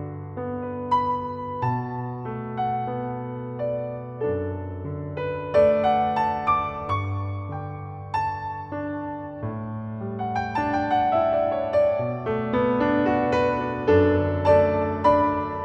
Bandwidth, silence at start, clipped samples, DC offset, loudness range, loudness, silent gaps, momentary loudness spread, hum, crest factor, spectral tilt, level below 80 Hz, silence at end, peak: 7.4 kHz; 0 s; under 0.1%; under 0.1%; 8 LU; -24 LUFS; none; 13 LU; none; 18 dB; -8.5 dB/octave; -50 dBFS; 0 s; -6 dBFS